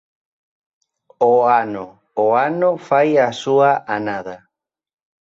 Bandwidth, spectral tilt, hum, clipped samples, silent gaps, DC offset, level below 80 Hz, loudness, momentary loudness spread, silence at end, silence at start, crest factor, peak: 7.8 kHz; -6 dB/octave; none; under 0.1%; none; under 0.1%; -66 dBFS; -17 LUFS; 13 LU; 0.85 s; 1.2 s; 16 dB; -2 dBFS